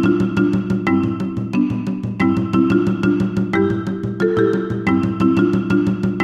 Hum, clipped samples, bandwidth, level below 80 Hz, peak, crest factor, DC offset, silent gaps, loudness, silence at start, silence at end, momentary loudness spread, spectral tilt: none; under 0.1%; 8.4 kHz; -44 dBFS; -4 dBFS; 14 dB; under 0.1%; none; -18 LUFS; 0 s; 0 s; 5 LU; -8.5 dB/octave